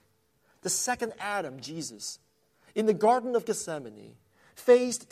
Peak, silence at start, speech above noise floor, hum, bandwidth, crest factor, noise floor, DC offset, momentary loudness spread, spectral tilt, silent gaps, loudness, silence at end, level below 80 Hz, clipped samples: -8 dBFS; 0.65 s; 41 dB; none; 15.5 kHz; 20 dB; -69 dBFS; under 0.1%; 16 LU; -3 dB/octave; none; -28 LUFS; 0.1 s; -72 dBFS; under 0.1%